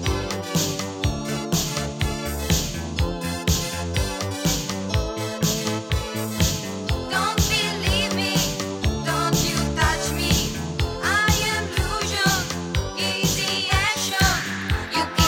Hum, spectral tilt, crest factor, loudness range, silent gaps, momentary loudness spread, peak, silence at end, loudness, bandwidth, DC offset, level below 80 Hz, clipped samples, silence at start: none; -3.5 dB/octave; 18 dB; 3 LU; none; 6 LU; -4 dBFS; 0 s; -23 LUFS; over 20 kHz; under 0.1%; -32 dBFS; under 0.1%; 0 s